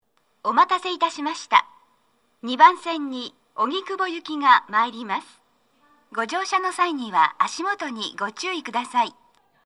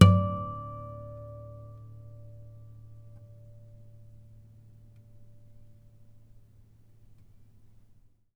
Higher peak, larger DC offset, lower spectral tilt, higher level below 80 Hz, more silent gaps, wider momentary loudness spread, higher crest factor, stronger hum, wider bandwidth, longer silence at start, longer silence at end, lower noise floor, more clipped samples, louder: about the same, -2 dBFS vs -2 dBFS; neither; second, -2 dB/octave vs -7 dB/octave; second, -80 dBFS vs -54 dBFS; neither; second, 13 LU vs 22 LU; second, 22 dB vs 30 dB; neither; first, 11.5 kHz vs 9.6 kHz; first, 0.45 s vs 0 s; second, 0.55 s vs 6.95 s; first, -66 dBFS vs -59 dBFS; neither; first, -22 LUFS vs -31 LUFS